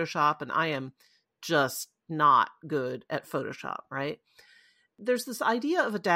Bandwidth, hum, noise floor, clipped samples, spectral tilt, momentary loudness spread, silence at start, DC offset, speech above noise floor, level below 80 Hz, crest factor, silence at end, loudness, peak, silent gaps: 16.5 kHz; none; -62 dBFS; under 0.1%; -4.5 dB/octave; 14 LU; 0 s; under 0.1%; 33 dB; -76 dBFS; 18 dB; 0 s; -29 LUFS; -10 dBFS; none